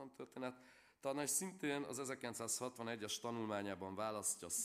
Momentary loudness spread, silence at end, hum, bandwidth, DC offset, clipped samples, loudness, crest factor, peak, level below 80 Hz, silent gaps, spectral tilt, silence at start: 9 LU; 0 s; none; 15.5 kHz; under 0.1%; under 0.1%; -43 LUFS; 20 dB; -26 dBFS; -86 dBFS; none; -2.5 dB/octave; 0 s